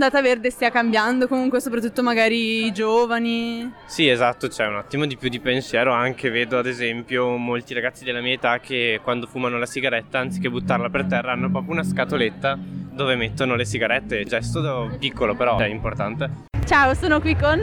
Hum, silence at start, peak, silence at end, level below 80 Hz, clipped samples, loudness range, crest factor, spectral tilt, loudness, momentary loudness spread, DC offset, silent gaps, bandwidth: none; 0 s; -4 dBFS; 0 s; -42 dBFS; under 0.1%; 3 LU; 18 dB; -5 dB/octave; -21 LUFS; 7 LU; under 0.1%; none; 17.5 kHz